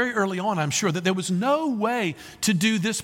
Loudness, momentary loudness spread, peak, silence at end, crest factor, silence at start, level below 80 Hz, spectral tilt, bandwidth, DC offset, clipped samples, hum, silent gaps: -24 LUFS; 4 LU; -8 dBFS; 0 s; 16 dB; 0 s; -64 dBFS; -4 dB/octave; 17 kHz; under 0.1%; under 0.1%; none; none